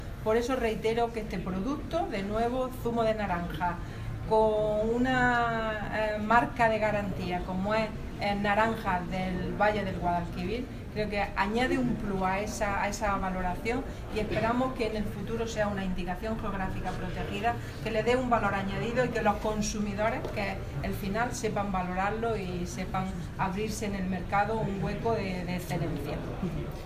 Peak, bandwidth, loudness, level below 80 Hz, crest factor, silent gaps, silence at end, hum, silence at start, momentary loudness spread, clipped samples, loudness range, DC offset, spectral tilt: -10 dBFS; 16 kHz; -30 LUFS; -42 dBFS; 20 dB; none; 0 s; none; 0 s; 8 LU; under 0.1%; 4 LU; under 0.1%; -6 dB/octave